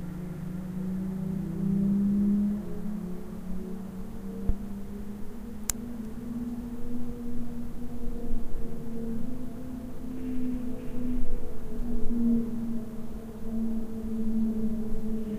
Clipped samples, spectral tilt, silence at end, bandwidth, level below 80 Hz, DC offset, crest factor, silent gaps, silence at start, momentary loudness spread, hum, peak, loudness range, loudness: under 0.1%; -7 dB/octave; 0 s; 15.5 kHz; -36 dBFS; under 0.1%; 22 dB; none; 0 s; 13 LU; none; -4 dBFS; 8 LU; -33 LUFS